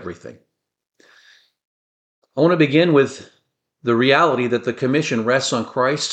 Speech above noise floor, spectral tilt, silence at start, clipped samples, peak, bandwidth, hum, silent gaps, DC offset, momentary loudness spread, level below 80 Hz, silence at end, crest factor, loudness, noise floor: 49 dB; -5 dB/octave; 0 s; under 0.1%; -2 dBFS; 9.2 kHz; none; 1.65-2.22 s; under 0.1%; 15 LU; -64 dBFS; 0 s; 18 dB; -18 LUFS; -66 dBFS